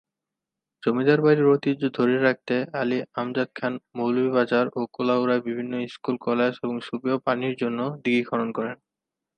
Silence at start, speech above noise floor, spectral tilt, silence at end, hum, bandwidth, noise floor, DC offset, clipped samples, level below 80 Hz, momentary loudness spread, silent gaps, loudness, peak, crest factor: 0.85 s; 63 dB; -8 dB/octave; 0.65 s; none; 8.8 kHz; -87 dBFS; under 0.1%; under 0.1%; -74 dBFS; 10 LU; none; -24 LUFS; -6 dBFS; 18 dB